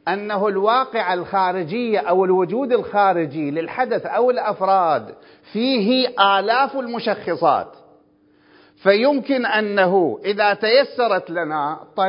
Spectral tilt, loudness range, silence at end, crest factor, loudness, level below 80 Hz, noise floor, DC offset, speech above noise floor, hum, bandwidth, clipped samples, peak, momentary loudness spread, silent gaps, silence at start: -9.5 dB/octave; 2 LU; 0 s; 18 dB; -19 LUFS; -68 dBFS; -56 dBFS; under 0.1%; 37 dB; none; 5.4 kHz; under 0.1%; 0 dBFS; 7 LU; none; 0.05 s